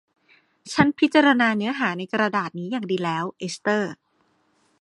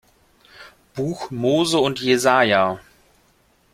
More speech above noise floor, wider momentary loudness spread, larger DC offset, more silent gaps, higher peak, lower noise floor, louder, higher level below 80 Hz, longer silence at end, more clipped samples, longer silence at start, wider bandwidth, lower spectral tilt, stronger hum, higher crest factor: about the same, 44 dB vs 41 dB; about the same, 11 LU vs 12 LU; neither; neither; about the same, -2 dBFS vs -2 dBFS; first, -66 dBFS vs -59 dBFS; second, -22 LUFS vs -19 LUFS; about the same, -62 dBFS vs -58 dBFS; about the same, 0.85 s vs 0.95 s; neither; about the same, 0.65 s vs 0.6 s; second, 11.5 kHz vs 16 kHz; about the same, -5 dB/octave vs -4.5 dB/octave; neither; about the same, 22 dB vs 20 dB